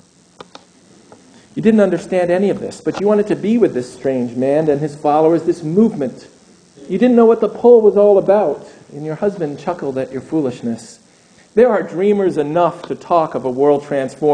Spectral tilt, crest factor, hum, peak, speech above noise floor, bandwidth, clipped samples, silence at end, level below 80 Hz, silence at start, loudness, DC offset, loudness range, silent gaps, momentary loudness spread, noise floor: -7.5 dB/octave; 16 dB; none; 0 dBFS; 34 dB; 9.8 kHz; under 0.1%; 0 s; -58 dBFS; 1.55 s; -15 LUFS; under 0.1%; 5 LU; none; 13 LU; -49 dBFS